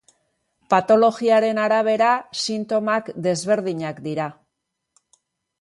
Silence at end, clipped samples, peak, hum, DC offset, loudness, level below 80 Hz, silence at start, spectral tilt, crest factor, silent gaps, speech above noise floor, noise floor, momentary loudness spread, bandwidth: 1.3 s; under 0.1%; -4 dBFS; none; under 0.1%; -20 LUFS; -68 dBFS; 0.7 s; -4.5 dB/octave; 18 dB; none; 59 dB; -78 dBFS; 11 LU; 11.5 kHz